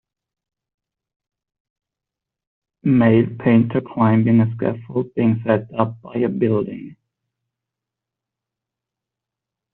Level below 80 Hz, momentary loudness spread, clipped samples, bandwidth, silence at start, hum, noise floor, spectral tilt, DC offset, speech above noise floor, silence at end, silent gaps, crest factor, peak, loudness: -58 dBFS; 10 LU; under 0.1%; 4 kHz; 2.85 s; none; -86 dBFS; -8.5 dB/octave; under 0.1%; 69 dB; 2.8 s; none; 18 dB; -2 dBFS; -18 LUFS